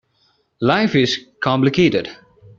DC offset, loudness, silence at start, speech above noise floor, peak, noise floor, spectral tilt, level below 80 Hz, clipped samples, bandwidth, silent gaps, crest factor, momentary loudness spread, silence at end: under 0.1%; -17 LUFS; 0.6 s; 46 dB; -2 dBFS; -62 dBFS; -4.5 dB/octave; -54 dBFS; under 0.1%; 7.6 kHz; none; 16 dB; 7 LU; 0.45 s